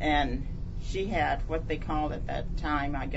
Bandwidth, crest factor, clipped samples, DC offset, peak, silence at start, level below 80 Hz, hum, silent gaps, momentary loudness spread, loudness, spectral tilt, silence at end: 8 kHz; 16 dB; under 0.1%; under 0.1%; -14 dBFS; 0 s; -34 dBFS; none; none; 8 LU; -32 LUFS; -6.5 dB/octave; 0 s